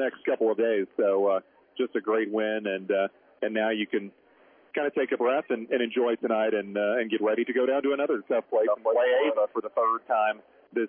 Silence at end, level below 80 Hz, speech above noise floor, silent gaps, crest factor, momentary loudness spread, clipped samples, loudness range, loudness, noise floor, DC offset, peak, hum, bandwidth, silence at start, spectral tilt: 0 s; -86 dBFS; 33 dB; none; 14 dB; 7 LU; under 0.1%; 4 LU; -27 LUFS; -59 dBFS; under 0.1%; -12 dBFS; none; 3.6 kHz; 0 s; -9 dB/octave